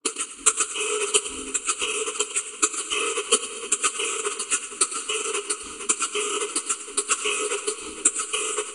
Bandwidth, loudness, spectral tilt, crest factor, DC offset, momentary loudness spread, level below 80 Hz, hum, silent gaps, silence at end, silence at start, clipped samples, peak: 11.5 kHz; -24 LUFS; 2 dB/octave; 26 dB; under 0.1%; 5 LU; -62 dBFS; none; none; 0 s; 0.05 s; under 0.1%; -2 dBFS